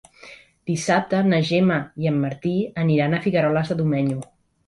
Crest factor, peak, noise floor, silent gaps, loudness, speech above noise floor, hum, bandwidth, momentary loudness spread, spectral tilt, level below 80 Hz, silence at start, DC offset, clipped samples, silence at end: 14 dB; -8 dBFS; -46 dBFS; none; -21 LUFS; 26 dB; none; 11.5 kHz; 7 LU; -6.5 dB/octave; -56 dBFS; 0.25 s; under 0.1%; under 0.1%; 0.45 s